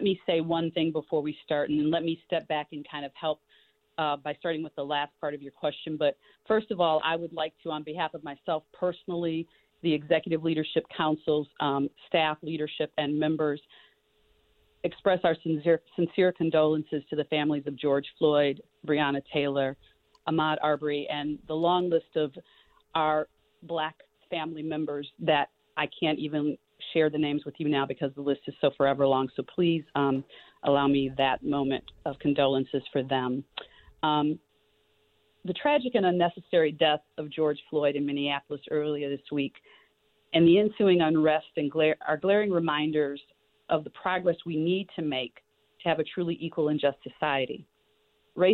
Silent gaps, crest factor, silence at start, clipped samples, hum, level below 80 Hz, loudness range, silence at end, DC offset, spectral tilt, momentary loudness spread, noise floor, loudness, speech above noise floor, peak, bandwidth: none; 18 dB; 0 s; under 0.1%; none; -66 dBFS; 5 LU; 0 s; under 0.1%; -9 dB/octave; 9 LU; -69 dBFS; -28 LUFS; 42 dB; -10 dBFS; 4.5 kHz